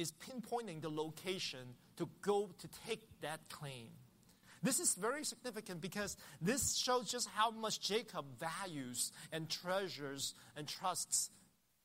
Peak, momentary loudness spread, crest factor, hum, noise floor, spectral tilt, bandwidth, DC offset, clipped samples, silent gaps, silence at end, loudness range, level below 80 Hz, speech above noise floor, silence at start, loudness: -20 dBFS; 13 LU; 22 dB; none; -66 dBFS; -2.5 dB/octave; 16 kHz; under 0.1%; under 0.1%; none; 0.45 s; 5 LU; -74 dBFS; 24 dB; 0 s; -41 LUFS